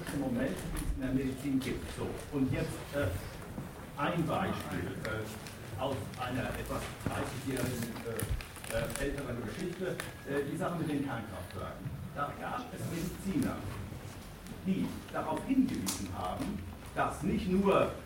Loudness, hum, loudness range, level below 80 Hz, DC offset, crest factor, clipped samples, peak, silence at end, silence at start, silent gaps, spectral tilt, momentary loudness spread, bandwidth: -36 LUFS; none; 3 LU; -48 dBFS; under 0.1%; 20 dB; under 0.1%; -16 dBFS; 0 s; 0 s; none; -5.5 dB/octave; 10 LU; 16.5 kHz